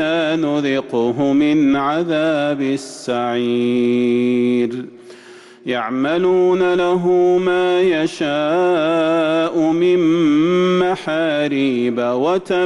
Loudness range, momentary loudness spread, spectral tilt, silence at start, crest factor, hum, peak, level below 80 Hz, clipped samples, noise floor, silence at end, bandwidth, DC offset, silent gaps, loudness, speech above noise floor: 3 LU; 6 LU; -6 dB/octave; 0 s; 8 dB; none; -8 dBFS; -58 dBFS; under 0.1%; -41 dBFS; 0 s; 11 kHz; under 0.1%; none; -17 LUFS; 25 dB